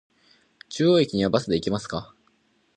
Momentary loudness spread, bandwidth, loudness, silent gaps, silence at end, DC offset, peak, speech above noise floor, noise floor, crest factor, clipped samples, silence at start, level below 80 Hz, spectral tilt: 14 LU; 9.4 kHz; -23 LUFS; none; 0.7 s; under 0.1%; -6 dBFS; 43 dB; -65 dBFS; 20 dB; under 0.1%; 0.7 s; -54 dBFS; -6 dB/octave